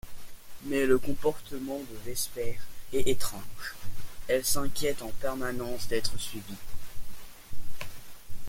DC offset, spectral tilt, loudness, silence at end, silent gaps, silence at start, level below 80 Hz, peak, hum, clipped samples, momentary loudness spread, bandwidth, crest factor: under 0.1%; -3.5 dB/octave; -32 LUFS; 0 s; none; 0.05 s; -44 dBFS; -10 dBFS; none; under 0.1%; 21 LU; 16.5 kHz; 16 dB